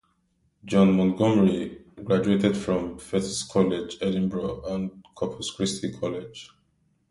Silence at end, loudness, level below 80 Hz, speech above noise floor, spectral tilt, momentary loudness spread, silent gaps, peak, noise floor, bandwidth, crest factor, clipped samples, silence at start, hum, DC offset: 0.65 s; -25 LUFS; -54 dBFS; 45 dB; -6 dB/octave; 13 LU; none; -6 dBFS; -69 dBFS; 11.5 kHz; 18 dB; under 0.1%; 0.65 s; none; under 0.1%